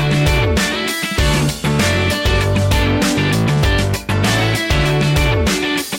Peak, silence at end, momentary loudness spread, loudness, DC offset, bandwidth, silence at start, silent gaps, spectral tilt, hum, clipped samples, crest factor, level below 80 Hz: -4 dBFS; 0 s; 3 LU; -15 LUFS; under 0.1%; 17 kHz; 0 s; none; -5 dB/octave; none; under 0.1%; 10 dB; -24 dBFS